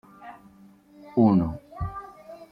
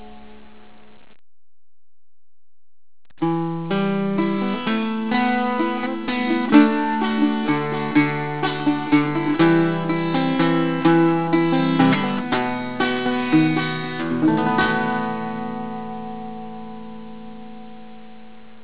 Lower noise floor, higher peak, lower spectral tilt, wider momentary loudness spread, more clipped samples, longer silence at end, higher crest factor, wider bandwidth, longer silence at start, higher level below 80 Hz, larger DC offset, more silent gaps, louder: first, -53 dBFS vs -49 dBFS; second, -8 dBFS vs -2 dBFS; about the same, -10.5 dB/octave vs -10.5 dB/octave; first, 25 LU vs 16 LU; neither; second, 0.05 s vs 0.3 s; about the same, 20 dB vs 20 dB; first, 5.2 kHz vs 4 kHz; first, 0.2 s vs 0 s; first, -48 dBFS vs -56 dBFS; second, under 0.1% vs 1%; neither; second, -25 LUFS vs -20 LUFS